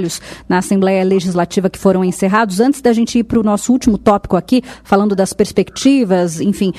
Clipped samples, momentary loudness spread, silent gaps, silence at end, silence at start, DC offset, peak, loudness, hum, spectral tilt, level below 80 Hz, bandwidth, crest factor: under 0.1%; 4 LU; none; 0 s; 0 s; under 0.1%; 0 dBFS; -14 LUFS; none; -6 dB/octave; -40 dBFS; 14 kHz; 12 dB